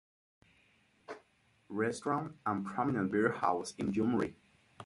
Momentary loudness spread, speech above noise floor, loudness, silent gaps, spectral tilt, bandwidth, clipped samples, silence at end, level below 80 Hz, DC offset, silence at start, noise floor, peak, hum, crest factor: 18 LU; 37 dB; -34 LUFS; none; -6.5 dB/octave; 11.5 kHz; under 0.1%; 0 s; -68 dBFS; under 0.1%; 1.1 s; -70 dBFS; -14 dBFS; none; 22 dB